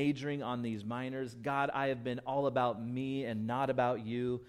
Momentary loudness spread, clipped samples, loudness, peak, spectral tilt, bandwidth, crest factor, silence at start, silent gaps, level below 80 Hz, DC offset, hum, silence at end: 7 LU; under 0.1%; -35 LUFS; -18 dBFS; -7.5 dB/octave; 13 kHz; 16 dB; 0 s; none; -70 dBFS; under 0.1%; none; 0 s